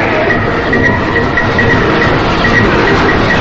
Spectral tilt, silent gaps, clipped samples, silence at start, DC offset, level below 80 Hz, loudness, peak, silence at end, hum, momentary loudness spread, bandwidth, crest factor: -6 dB/octave; none; under 0.1%; 0 s; under 0.1%; -24 dBFS; -9 LUFS; 0 dBFS; 0 s; none; 3 LU; 8 kHz; 10 dB